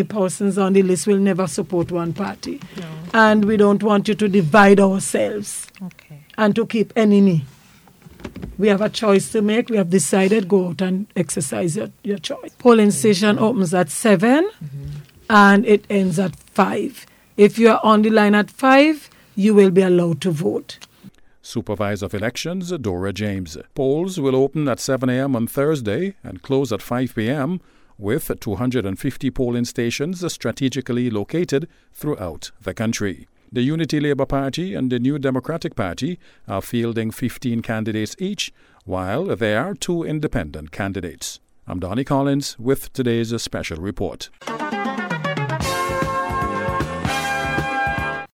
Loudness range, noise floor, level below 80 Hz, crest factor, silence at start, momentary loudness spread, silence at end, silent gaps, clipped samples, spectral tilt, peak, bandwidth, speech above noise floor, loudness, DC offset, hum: 8 LU; -49 dBFS; -44 dBFS; 18 dB; 0 s; 15 LU; 0.05 s; none; under 0.1%; -5.5 dB/octave; -2 dBFS; 17 kHz; 31 dB; -19 LUFS; under 0.1%; none